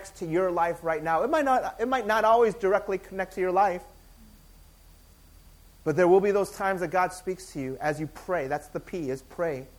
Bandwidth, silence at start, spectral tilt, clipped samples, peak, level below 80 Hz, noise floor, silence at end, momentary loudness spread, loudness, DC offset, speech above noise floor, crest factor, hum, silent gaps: 19 kHz; 0 s; -6 dB/octave; under 0.1%; -10 dBFS; -54 dBFS; -54 dBFS; 0.1 s; 13 LU; -26 LUFS; under 0.1%; 28 dB; 18 dB; none; none